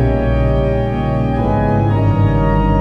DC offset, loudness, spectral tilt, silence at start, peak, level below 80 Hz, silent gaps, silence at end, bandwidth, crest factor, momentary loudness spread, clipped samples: under 0.1%; -15 LUFS; -10 dB/octave; 0 s; -2 dBFS; -20 dBFS; none; 0 s; 5 kHz; 10 dB; 3 LU; under 0.1%